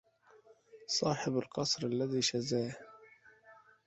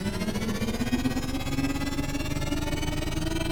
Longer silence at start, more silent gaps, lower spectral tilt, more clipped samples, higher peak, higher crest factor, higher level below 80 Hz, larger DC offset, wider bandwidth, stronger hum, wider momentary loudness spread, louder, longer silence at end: first, 0.75 s vs 0 s; neither; about the same, -4 dB/octave vs -5 dB/octave; neither; second, -18 dBFS vs -14 dBFS; about the same, 18 dB vs 14 dB; second, -72 dBFS vs -34 dBFS; neither; second, 8.2 kHz vs over 20 kHz; neither; first, 16 LU vs 3 LU; second, -34 LUFS vs -30 LUFS; first, 0.35 s vs 0 s